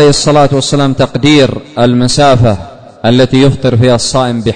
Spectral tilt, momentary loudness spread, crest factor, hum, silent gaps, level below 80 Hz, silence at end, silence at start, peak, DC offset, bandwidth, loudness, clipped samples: -5.5 dB/octave; 5 LU; 8 dB; none; none; -30 dBFS; 0 s; 0 s; 0 dBFS; under 0.1%; 9.6 kHz; -8 LUFS; 0.8%